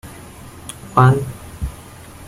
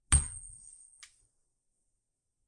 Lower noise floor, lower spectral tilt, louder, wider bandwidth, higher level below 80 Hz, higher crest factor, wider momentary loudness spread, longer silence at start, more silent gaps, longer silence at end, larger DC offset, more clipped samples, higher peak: second, -38 dBFS vs -83 dBFS; first, -7 dB/octave vs -2 dB/octave; first, -16 LUFS vs -31 LUFS; first, 15 kHz vs 11.5 kHz; about the same, -38 dBFS vs -42 dBFS; second, 18 dB vs 28 dB; about the same, 24 LU vs 26 LU; about the same, 0.05 s vs 0.1 s; neither; second, 0 s vs 1.95 s; neither; neither; first, -2 dBFS vs -8 dBFS